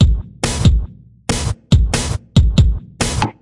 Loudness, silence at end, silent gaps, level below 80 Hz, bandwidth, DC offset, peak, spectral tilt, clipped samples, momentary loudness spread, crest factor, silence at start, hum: -17 LUFS; 0.1 s; none; -20 dBFS; 11.5 kHz; under 0.1%; 0 dBFS; -5 dB/octave; under 0.1%; 7 LU; 14 dB; 0 s; none